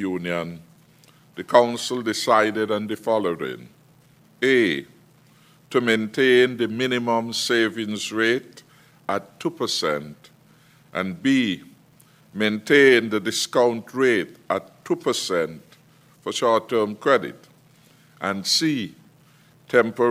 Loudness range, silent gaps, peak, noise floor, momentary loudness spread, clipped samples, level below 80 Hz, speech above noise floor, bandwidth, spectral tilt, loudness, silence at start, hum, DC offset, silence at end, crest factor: 6 LU; none; 0 dBFS; -55 dBFS; 12 LU; under 0.1%; -68 dBFS; 33 dB; 16 kHz; -4 dB/octave; -22 LUFS; 0 s; none; under 0.1%; 0 s; 22 dB